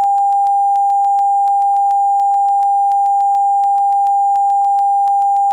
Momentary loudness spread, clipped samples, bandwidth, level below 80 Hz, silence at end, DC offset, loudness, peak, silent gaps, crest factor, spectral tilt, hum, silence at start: 0 LU; under 0.1%; 9.4 kHz; -72 dBFS; 0 s; under 0.1%; -13 LUFS; -8 dBFS; none; 4 dB; -0.5 dB/octave; none; 0 s